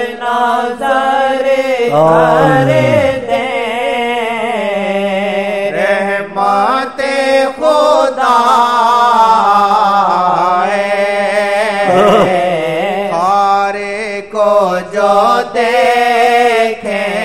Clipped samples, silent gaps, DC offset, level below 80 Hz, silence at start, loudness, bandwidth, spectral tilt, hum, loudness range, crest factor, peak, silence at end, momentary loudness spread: under 0.1%; none; 0.6%; -50 dBFS; 0 s; -11 LUFS; 15.5 kHz; -5 dB/octave; none; 4 LU; 12 dB; 0 dBFS; 0 s; 7 LU